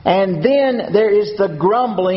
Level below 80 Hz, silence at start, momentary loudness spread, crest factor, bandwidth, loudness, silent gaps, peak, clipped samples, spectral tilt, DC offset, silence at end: -52 dBFS; 0.05 s; 2 LU; 14 dB; 6 kHz; -15 LUFS; none; -2 dBFS; under 0.1%; -5 dB/octave; under 0.1%; 0 s